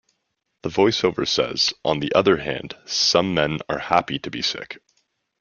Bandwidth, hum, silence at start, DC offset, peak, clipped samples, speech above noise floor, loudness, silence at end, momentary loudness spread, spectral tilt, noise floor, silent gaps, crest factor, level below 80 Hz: 7.2 kHz; none; 0.65 s; under 0.1%; -2 dBFS; under 0.1%; 54 dB; -21 LUFS; 0.65 s; 12 LU; -3.5 dB/octave; -75 dBFS; none; 22 dB; -54 dBFS